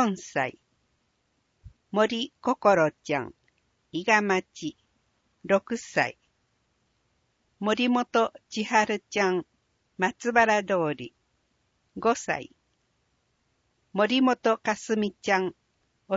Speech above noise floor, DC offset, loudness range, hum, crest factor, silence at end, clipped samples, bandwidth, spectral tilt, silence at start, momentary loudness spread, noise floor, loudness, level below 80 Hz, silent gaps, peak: 47 dB; under 0.1%; 5 LU; none; 22 dB; 0 s; under 0.1%; 8 kHz; -4.5 dB/octave; 0 s; 12 LU; -73 dBFS; -26 LUFS; -66 dBFS; none; -6 dBFS